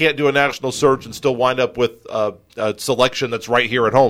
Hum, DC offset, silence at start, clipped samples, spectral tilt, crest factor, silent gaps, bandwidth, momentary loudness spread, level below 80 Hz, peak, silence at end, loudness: none; under 0.1%; 0 s; under 0.1%; -4.5 dB/octave; 16 dB; none; 16 kHz; 7 LU; -52 dBFS; -2 dBFS; 0 s; -18 LUFS